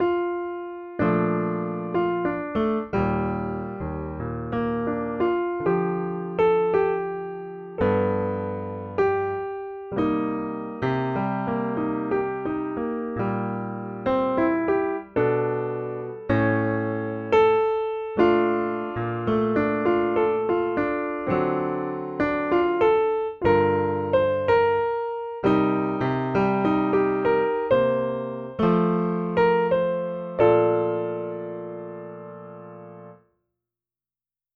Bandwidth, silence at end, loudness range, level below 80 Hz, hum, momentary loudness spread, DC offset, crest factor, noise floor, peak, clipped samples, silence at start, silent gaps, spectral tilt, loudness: 5.6 kHz; 1.4 s; 4 LU; -50 dBFS; none; 11 LU; under 0.1%; 18 dB; under -90 dBFS; -6 dBFS; under 0.1%; 0 s; none; -9.5 dB/octave; -24 LUFS